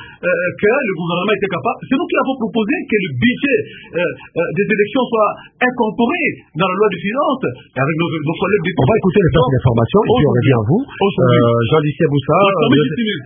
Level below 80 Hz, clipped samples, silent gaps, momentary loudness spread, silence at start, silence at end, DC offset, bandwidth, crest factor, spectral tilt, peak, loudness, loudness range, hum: -40 dBFS; under 0.1%; none; 6 LU; 0 s; 0 s; under 0.1%; 3.7 kHz; 14 dB; -12.5 dB/octave; 0 dBFS; -15 LUFS; 4 LU; none